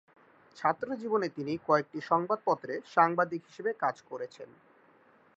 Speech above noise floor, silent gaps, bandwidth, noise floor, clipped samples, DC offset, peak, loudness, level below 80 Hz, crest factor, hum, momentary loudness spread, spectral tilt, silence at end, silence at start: 32 dB; none; 8 kHz; -63 dBFS; under 0.1%; under 0.1%; -10 dBFS; -31 LUFS; -78 dBFS; 22 dB; none; 14 LU; -6.5 dB/octave; 0.9 s; 0.55 s